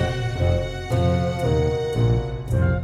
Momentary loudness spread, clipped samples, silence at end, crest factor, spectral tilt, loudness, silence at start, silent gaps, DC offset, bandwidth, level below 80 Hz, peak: 4 LU; under 0.1%; 0 s; 12 dB; -7.5 dB/octave; -22 LUFS; 0 s; none; under 0.1%; 12 kHz; -32 dBFS; -8 dBFS